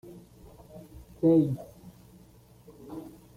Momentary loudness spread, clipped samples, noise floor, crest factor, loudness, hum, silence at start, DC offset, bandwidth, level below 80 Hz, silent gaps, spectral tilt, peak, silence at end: 28 LU; under 0.1%; -56 dBFS; 20 dB; -26 LUFS; none; 0.05 s; under 0.1%; 15 kHz; -58 dBFS; none; -10 dB/octave; -12 dBFS; 0.3 s